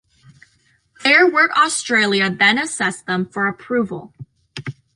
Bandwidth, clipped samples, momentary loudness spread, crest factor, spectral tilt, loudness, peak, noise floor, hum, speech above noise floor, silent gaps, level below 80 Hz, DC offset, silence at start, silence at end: 11.5 kHz; under 0.1%; 20 LU; 18 dB; -3 dB/octave; -16 LUFS; -2 dBFS; -60 dBFS; none; 43 dB; none; -62 dBFS; under 0.1%; 1 s; 0.25 s